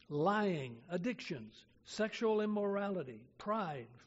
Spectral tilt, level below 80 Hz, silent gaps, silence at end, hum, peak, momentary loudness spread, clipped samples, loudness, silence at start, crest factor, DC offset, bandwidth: -5 dB/octave; -76 dBFS; none; 0.1 s; none; -22 dBFS; 13 LU; under 0.1%; -38 LUFS; 0.1 s; 16 dB; under 0.1%; 7.6 kHz